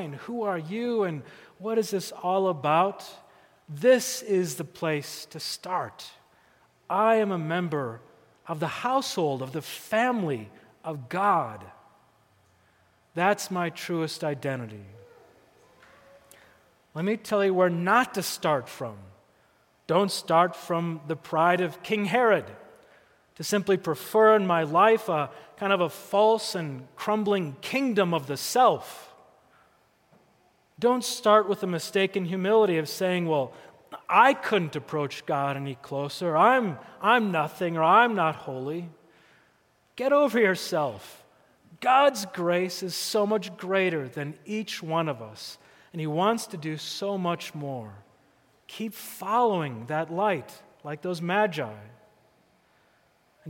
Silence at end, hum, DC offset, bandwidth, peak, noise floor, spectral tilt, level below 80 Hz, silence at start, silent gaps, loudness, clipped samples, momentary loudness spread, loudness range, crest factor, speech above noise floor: 0 s; none; under 0.1%; 17 kHz; -6 dBFS; -65 dBFS; -5 dB/octave; -76 dBFS; 0 s; none; -26 LUFS; under 0.1%; 16 LU; 7 LU; 22 dB; 39 dB